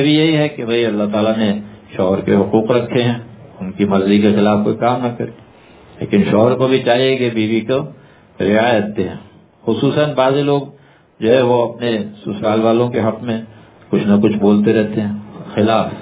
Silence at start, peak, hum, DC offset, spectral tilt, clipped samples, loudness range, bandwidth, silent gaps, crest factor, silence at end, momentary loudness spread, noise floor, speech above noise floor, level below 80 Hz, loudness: 0 s; 0 dBFS; none; under 0.1%; -11 dB/octave; under 0.1%; 2 LU; 4 kHz; none; 16 dB; 0 s; 12 LU; -43 dBFS; 28 dB; -48 dBFS; -15 LUFS